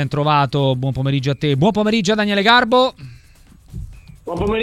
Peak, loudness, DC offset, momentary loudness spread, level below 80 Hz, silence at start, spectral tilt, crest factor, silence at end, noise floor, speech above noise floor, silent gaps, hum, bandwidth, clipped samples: 0 dBFS; -16 LUFS; under 0.1%; 22 LU; -40 dBFS; 0 s; -6 dB/octave; 18 dB; 0 s; -46 dBFS; 30 dB; none; none; 11.5 kHz; under 0.1%